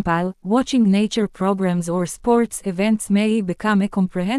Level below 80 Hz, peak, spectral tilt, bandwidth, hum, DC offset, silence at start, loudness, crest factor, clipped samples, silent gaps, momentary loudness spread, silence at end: -48 dBFS; -4 dBFS; -6 dB/octave; 12 kHz; none; under 0.1%; 0 s; -20 LUFS; 14 dB; under 0.1%; none; 5 LU; 0 s